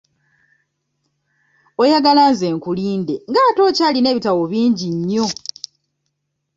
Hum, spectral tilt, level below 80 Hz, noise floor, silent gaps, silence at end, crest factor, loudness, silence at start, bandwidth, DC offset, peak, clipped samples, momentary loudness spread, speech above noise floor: none; -5 dB/octave; -60 dBFS; -73 dBFS; none; 1.25 s; 16 dB; -16 LUFS; 1.8 s; 7.8 kHz; under 0.1%; -2 dBFS; under 0.1%; 14 LU; 58 dB